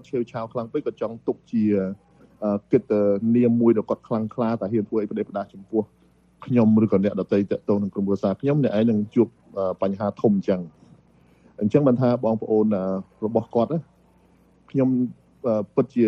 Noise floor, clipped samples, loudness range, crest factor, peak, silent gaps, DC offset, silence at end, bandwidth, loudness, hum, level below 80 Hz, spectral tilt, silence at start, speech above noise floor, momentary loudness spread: -57 dBFS; under 0.1%; 3 LU; 18 dB; -4 dBFS; none; under 0.1%; 0 s; 6.2 kHz; -23 LUFS; none; -62 dBFS; -10 dB/octave; 0.15 s; 35 dB; 10 LU